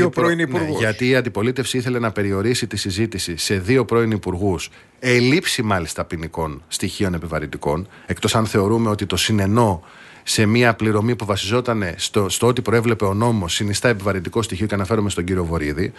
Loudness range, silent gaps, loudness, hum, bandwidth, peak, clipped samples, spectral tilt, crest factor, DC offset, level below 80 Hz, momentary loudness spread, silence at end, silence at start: 3 LU; none; -20 LUFS; none; 12.5 kHz; -2 dBFS; under 0.1%; -5 dB/octave; 18 dB; under 0.1%; -44 dBFS; 8 LU; 0.05 s; 0 s